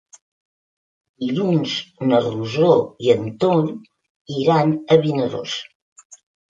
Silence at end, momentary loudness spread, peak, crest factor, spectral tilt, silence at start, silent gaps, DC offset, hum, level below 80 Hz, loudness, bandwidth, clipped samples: 0.4 s; 11 LU; -2 dBFS; 18 dB; -6.5 dB/octave; 1.2 s; 4.10-4.25 s, 5.75-5.96 s, 6.05-6.10 s; under 0.1%; none; -62 dBFS; -19 LUFS; 7.8 kHz; under 0.1%